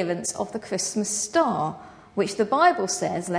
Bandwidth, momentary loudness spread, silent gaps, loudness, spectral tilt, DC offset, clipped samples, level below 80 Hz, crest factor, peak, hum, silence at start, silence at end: 11 kHz; 11 LU; none; -24 LUFS; -3.5 dB/octave; under 0.1%; under 0.1%; -64 dBFS; 18 dB; -6 dBFS; none; 0 s; 0 s